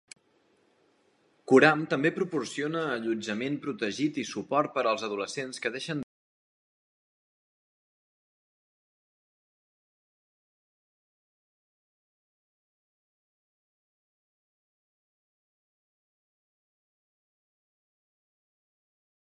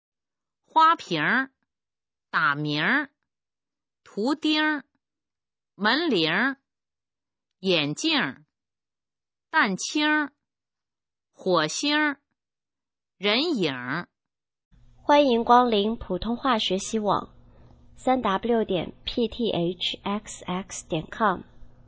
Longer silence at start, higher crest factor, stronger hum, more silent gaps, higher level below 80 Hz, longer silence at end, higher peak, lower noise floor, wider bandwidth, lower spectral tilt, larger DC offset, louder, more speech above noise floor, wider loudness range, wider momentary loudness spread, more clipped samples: first, 1.5 s vs 0.75 s; first, 30 dB vs 22 dB; neither; second, none vs 14.65-14.71 s; second, -80 dBFS vs -56 dBFS; first, 13.2 s vs 0.2 s; about the same, -4 dBFS vs -4 dBFS; second, -68 dBFS vs under -90 dBFS; first, 11.5 kHz vs 8 kHz; about the same, -5 dB/octave vs -4 dB/octave; neither; second, -28 LUFS vs -24 LUFS; second, 40 dB vs over 66 dB; first, 12 LU vs 5 LU; about the same, 13 LU vs 12 LU; neither